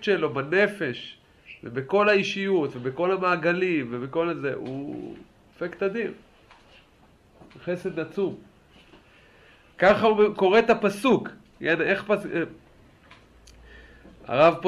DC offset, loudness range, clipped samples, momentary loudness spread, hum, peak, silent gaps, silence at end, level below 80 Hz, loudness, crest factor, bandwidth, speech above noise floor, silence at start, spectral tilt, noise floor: under 0.1%; 12 LU; under 0.1%; 16 LU; none; -6 dBFS; none; 0 s; -60 dBFS; -24 LUFS; 20 dB; 12.5 kHz; 33 dB; 0 s; -6 dB/octave; -57 dBFS